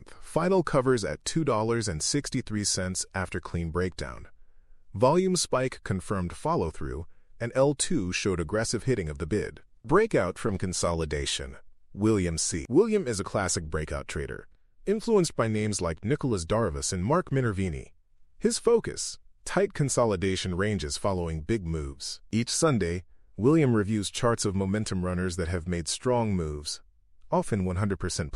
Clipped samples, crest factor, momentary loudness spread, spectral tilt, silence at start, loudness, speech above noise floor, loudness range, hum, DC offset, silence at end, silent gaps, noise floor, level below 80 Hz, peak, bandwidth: under 0.1%; 18 dB; 10 LU; -5 dB/octave; 0 s; -28 LUFS; 23 dB; 2 LU; none; under 0.1%; 0 s; none; -50 dBFS; -46 dBFS; -10 dBFS; 14 kHz